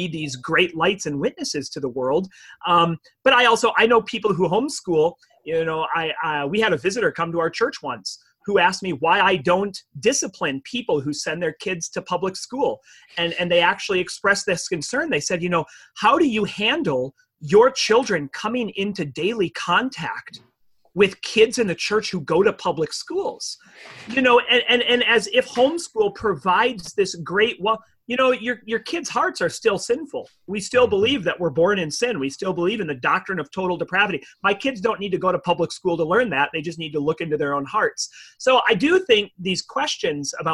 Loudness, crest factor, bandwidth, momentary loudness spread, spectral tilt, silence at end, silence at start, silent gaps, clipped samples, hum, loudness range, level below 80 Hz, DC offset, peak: -21 LUFS; 18 dB; 12.5 kHz; 10 LU; -3.5 dB/octave; 0 s; 0 s; none; under 0.1%; none; 4 LU; -58 dBFS; under 0.1%; -4 dBFS